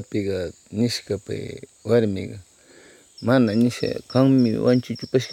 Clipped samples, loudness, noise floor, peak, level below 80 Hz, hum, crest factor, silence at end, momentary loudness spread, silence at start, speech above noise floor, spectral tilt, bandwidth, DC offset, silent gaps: under 0.1%; -22 LUFS; -50 dBFS; -4 dBFS; -58 dBFS; none; 18 dB; 0 s; 14 LU; 0 s; 29 dB; -6.5 dB/octave; 14.5 kHz; under 0.1%; none